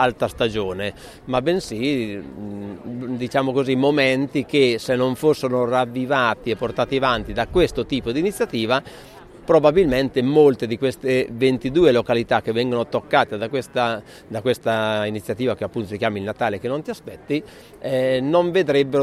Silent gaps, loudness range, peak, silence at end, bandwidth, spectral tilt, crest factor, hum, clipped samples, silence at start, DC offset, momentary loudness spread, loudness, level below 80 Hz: none; 5 LU; -2 dBFS; 0 s; 14.5 kHz; -6 dB/octave; 20 dB; none; under 0.1%; 0 s; under 0.1%; 12 LU; -21 LUFS; -46 dBFS